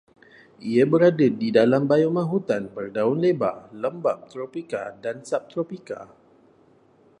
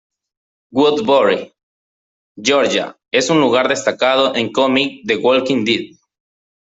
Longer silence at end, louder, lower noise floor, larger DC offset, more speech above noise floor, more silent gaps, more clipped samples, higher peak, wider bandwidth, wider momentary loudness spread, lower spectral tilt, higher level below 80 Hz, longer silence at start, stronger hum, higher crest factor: first, 1.15 s vs 0.85 s; second, -23 LUFS vs -15 LUFS; second, -57 dBFS vs under -90 dBFS; neither; second, 35 dB vs over 75 dB; second, none vs 1.63-2.35 s; neither; about the same, -4 dBFS vs -2 dBFS; first, 10.5 kHz vs 8 kHz; first, 15 LU vs 7 LU; first, -7.5 dB/octave vs -3.5 dB/octave; second, -70 dBFS vs -60 dBFS; second, 0.6 s vs 0.75 s; neither; first, 20 dB vs 14 dB